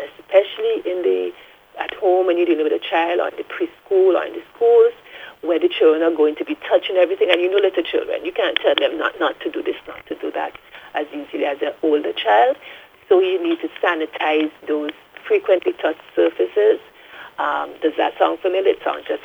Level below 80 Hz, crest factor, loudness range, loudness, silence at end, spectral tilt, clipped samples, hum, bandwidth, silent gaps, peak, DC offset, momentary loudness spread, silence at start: -66 dBFS; 20 dB; 4 LU; -19 LUFS; 0.05 s; -4.5 dB/octave; under 0.1%; none; 5.4 kHz; none; 0 dBFS; under 0.1%; 13 LU; 0 s